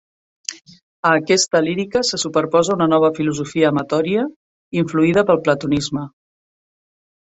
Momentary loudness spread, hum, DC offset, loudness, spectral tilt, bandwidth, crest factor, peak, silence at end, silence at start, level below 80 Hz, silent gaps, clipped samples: 13 LU; none; under 0.1%; -18 LUFS; -4.5 dB/octave; 8.2 kHz; 18 dB; -2 dBFS; 1.3 s; 0.5 s; -56 dBFS; 0.82-1.03 s, 4.36-4.71 s; under 0.1%